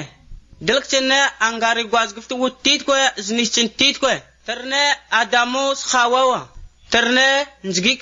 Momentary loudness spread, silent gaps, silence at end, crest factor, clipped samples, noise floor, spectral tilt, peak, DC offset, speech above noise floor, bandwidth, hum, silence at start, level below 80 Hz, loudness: 8 LU; none; 0 s; 18 dB; under 0.1%; -40 dBFS; -1.5 dB/octave; -2 dBFS; under 0.1%; 22 dB; 7.8 kHz; none; 0 s; -48 dBFS; -17 LUFS